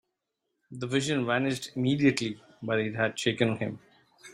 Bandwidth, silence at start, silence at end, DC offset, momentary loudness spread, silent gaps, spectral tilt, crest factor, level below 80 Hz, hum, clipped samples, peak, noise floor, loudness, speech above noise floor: 15 kHz; 0.7 s; 0 s; under 0.1%; 13 LU; none; -5 dB/octave; 20 dB; -66 dBFS; none; under 0.1%; -10 dBFS; -82 dBFS; -28 LUFS; 54 dB